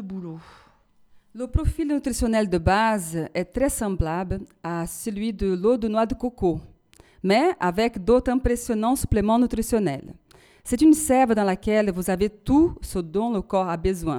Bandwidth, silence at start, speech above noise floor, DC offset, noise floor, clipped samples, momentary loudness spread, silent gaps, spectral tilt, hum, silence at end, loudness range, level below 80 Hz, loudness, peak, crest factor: 18.5 kHz; 0 s; 34 dB; under 0.1%; -57 dBFS; under 0.1%; 11 LU; none; -5.5 dB/octave; none; 0 s; 4 LU; -36 dBFS; -23 LUFS; -6 dBFS; 16 dB